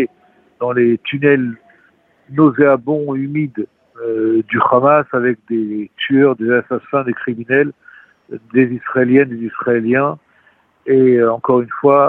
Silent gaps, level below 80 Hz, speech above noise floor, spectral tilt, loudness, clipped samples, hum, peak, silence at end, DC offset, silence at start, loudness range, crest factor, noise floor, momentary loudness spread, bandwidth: none; -62 dBFS; 40 dB; -10 dB/octave; -15 LUFS; under 0.1%; none; 0 dBFS; 0 s; under 0.1%; 0 s; 2 LU; 16 dB; -54 dBFS; 11 LU; 4 kHz